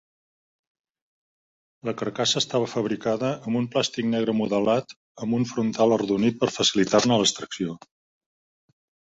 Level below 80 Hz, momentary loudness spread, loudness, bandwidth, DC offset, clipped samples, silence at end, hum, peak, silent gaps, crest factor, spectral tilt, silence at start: -62 dBFS; 10 LU; -24 LUFS; 8.4 kHz; under 0.1%; under 0.1%; 1.4 s; none; -4 dBFS; 4.96-5.15 s; 20 dB; -4 dB/octave; 1.85 s